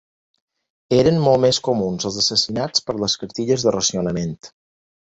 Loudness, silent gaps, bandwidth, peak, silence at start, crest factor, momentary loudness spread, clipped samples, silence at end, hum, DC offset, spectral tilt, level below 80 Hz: -19 LUFS; none; 8.2 kHz; -2 dBFS; 0.9 s; 18 dB; 8 LU; under 0.1%; 0.6 s; none; under 0.1%; -4.5 dB/octave; -50 dBFS